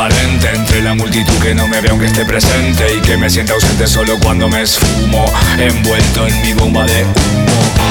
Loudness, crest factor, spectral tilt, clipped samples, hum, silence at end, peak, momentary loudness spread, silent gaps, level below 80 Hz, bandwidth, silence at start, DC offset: -11 LUFS; 10 dB; -4.5 dB/octave; under 0.1%; none; 0 s; 0 dBFS; 1 LU; none; -18 dBFS; over 20 kHz; 0 s; under 0.1%